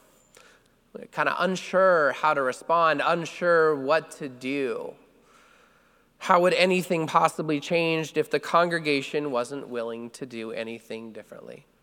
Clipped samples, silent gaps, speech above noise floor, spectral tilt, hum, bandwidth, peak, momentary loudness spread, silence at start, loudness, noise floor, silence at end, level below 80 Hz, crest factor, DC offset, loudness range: under 0.1%; none; 36 dB; -5 dB/octave; none; 17.5 kHz; -4 dBFS; 17 LU; 0.95 s; -24 LUFS; -61 dBFS; 0.25 s; -72 dBFS; 22 dB; under 0.1%; 5 LU